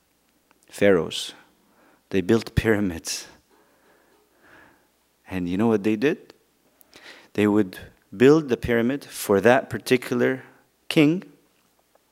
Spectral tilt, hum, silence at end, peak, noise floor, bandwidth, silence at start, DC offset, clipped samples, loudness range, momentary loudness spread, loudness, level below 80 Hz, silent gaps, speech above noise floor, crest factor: -5.5 dB/octave; none; 0.9 s; 0 dBFS; -65 dBFS; 16 kHz; 0.75 s; under 0.1%; under 0.1%; 7 LU; 14 LU; -22 LUFS; -48 dBFS; none; 44 dB; 24 dB